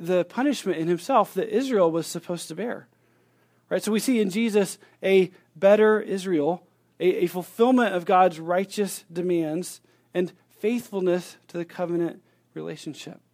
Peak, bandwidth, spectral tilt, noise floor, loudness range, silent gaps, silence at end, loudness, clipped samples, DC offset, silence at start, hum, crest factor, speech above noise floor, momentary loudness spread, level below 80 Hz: -6 dBFS; 16 kHz; -5.5 dB/octave; -64 dBFS; 6 LU; none; 0.2 s; -24 LUFS; under 0.1%; under 0.1%; 0 s; none; 18 dB; 40 dB; 15 LU; -78 dBFS